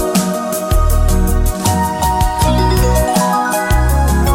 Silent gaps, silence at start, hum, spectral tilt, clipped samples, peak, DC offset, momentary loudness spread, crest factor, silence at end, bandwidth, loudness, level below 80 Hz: none; 0 s; none; -5 dB/octave; under 0.1%; -2 dBFS; under 0.1%; 3 LU; 12 dB; 0 s; 16.5 kHz; -14 LUFS; -16 dBFS